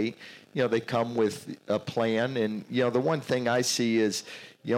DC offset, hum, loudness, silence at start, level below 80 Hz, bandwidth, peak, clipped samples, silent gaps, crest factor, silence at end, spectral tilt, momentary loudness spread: under 0.1%; none; -28 LUFS; 0 s; -76 dBFS; 16.5 kHz; -12 dBFS; under 0.1%; none; 16 dB; 0 s; -4.5 dB/octave; 11 LU